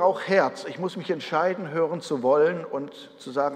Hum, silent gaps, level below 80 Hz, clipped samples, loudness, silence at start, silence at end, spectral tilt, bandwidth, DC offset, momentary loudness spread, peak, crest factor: none; none; -80 dBFS; under 0.1%; -25 LUFS; 0 s; 0 s; -5.5 dB/octave; 10 kHz; under 0.1%; 12 LU; -6 dBFS; 18 dB